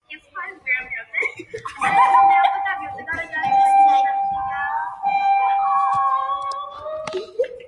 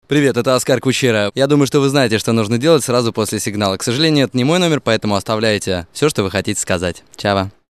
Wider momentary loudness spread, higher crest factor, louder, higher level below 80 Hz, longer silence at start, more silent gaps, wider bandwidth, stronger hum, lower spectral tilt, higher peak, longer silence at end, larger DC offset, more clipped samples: first, 16 LU vs 5 LU; about the same, 16 dB vs 16 dB; second, -19 LUFS vs -16 LUFS; second, -60 dBFS vs -52 dBFS; about the same, 0.1 s vs 0.1 s; neither; second, 11 kHz vs 13 kHz; neither; second, -3 dB/octave vs -4.5 dB/octave; second, -4 dBFS vs 0 dBFS; second, 0 s vs 0.2 s; second, under 0.1% vs 0.2%; neither